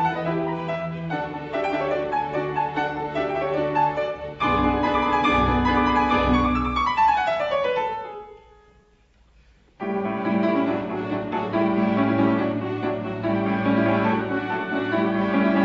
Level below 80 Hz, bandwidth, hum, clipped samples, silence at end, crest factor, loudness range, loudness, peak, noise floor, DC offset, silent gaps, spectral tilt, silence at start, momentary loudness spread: -40 dBFS; 7.8 kHz; none; under 0.1%; 0 s; 14 dB; 7 LU; -23 LUFS; -8 dBFS; -58 dBFS; under 0.1%; none; -7.5 dB/octave; 0 s; 8 LU